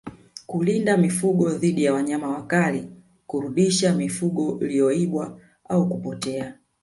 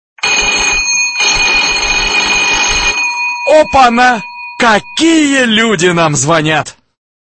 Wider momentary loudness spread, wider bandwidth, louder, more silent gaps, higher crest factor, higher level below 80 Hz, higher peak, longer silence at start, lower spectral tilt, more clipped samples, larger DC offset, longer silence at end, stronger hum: first, 12 LU vs 5 LU; first, 11.5 kHz vs 9.2 kHz; second, -23 LUFS vs -9 LUFS; neither; first, 16 dB vs 10 dB; second, -62 dBFS vs -32 dBFS; second, -8 dBFS vs 0 dBFS; second, 0.05 s vs 0.25 s; first, -5.5 dB/octave vs -2.5 dB/octave; second, under 0.1% vs 0.1%; neither; second, 0.3 s vs 0.5 s; neither